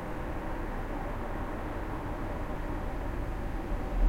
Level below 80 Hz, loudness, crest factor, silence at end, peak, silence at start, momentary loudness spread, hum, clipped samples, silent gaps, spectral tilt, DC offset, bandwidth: -36 dBFS; -37 LUFS; 16 dB; 0 s; -16 dBFS; 0 s; 1 LU; none; under 0.1%; none; -7.5 dB/octave; under 0.1%; 16 kHz